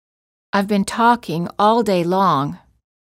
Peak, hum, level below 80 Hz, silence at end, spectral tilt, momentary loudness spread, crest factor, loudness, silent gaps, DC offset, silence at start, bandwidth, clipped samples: -4 dBFS; none; -56 dBFS; 0.6 s; -6 dB/octave; 7 LU; 16 dB; -18 LUFS; none; under 0.1%; 0.55 s; 16 kHz; under 0.1%